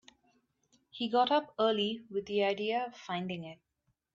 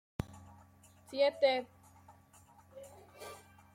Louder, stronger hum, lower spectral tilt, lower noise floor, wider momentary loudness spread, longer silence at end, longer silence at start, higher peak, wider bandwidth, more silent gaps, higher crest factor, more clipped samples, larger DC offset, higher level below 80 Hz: about the same, -32 LUFS vs -34 LUFS; neither; about the same, -5.5 dB/octave vs -4.5 dB/octave; first, -73 dBFS vs -62 dBFS; second, 12 LU vs 25 LU; first, 0.6 s vs 0.4 s; first, 0.95 s vs 0.2 s; first, -14 dBFS vs -18 dBFS; second, 7.6 kHz vs 15.5 kHz; neither; about the same, 20 dB vs 22 dB; neither; neither; second, -76 dBFS vs -64 dBFS